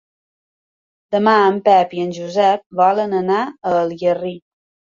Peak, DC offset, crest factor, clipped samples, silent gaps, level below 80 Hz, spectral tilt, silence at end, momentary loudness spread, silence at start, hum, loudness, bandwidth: -2 dBFS; under 0.1%; 16 dB; under 0.1%; 2.66-2.70 s; -62 dBFS; -6 dB/octave; 0.55 s; 9 LU; 1.1 s; none; -16 LUFS; 7.6 kHz